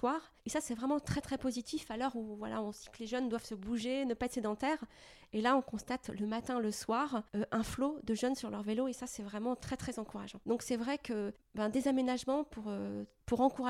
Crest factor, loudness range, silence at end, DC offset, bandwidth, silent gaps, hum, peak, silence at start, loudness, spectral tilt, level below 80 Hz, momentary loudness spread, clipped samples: 20 dB; 2 LU; 0 s; under 0.1%; 15 kHz; none; none; -16 dBFS; 0 s; -37 LUFS; -5 dB/octave; -60 dBFS; 9 LU; under 0.1%